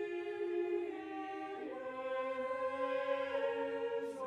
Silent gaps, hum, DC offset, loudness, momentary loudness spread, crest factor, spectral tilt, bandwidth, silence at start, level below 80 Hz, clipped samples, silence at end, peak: none; none; under 0.1%; -39 LUFS; 7 LU; 14 dB; -5 dB/octave; 10.5 kHz; 0 s; -84 dBFS; under 0.1%; 0 s; -24 dBFS